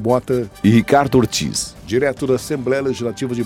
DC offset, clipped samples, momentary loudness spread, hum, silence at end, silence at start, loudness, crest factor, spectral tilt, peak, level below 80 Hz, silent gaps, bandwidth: under 0.1%; under 0.1%; 8 LU; none; 0 s; 0 s; -18 LUFS; 16 dB; -5.5 dB/octave; -2 dBFS; -44 dBFS; none; 16.5 kHz